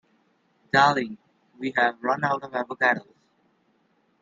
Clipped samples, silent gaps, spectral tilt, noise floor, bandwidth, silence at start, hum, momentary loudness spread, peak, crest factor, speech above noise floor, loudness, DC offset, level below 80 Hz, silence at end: under 0.1%; none; -5 dB/octave; -67 dBFS; 7.6 kHz; 0.75 s; none; 13 LU; -4 dBFS; 22 dB; 43 dB; -24 LUFS; under 0.1%; -70 dBFS; 1.2 s